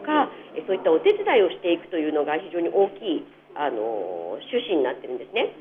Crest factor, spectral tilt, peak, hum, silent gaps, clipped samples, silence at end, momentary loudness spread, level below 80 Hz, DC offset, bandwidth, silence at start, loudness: 16 dB; -7 dB/octave; -8 dBFS; 50 Hz at -60 dBFS; none; under 0.1%; 0 s; 11 LU; -72 dBFS; under 0.1%; 3.9 kHz; 0 s; -24 LUFS